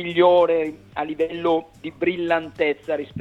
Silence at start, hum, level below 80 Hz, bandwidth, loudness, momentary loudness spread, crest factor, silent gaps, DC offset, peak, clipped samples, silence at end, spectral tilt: 0 s; none; -58 dBFS; 7.4 kHz; -22 LUFS; 13 LU; 18 dB; none; under 0.1%; -4 dBFS; under 0.1%; 0 s; -7 dB/octave